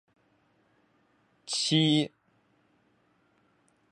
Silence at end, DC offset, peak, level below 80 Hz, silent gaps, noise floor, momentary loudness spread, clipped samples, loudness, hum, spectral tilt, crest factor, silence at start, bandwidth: 1.85 s; under 0.1%; -12 dBFS; -80 dBFS; none; -69 dBFS; 15 LU; under 0.1%; -27 LUFS; none; -4.5 dB/octave; 22 dB; 1.45 s; 11 kHz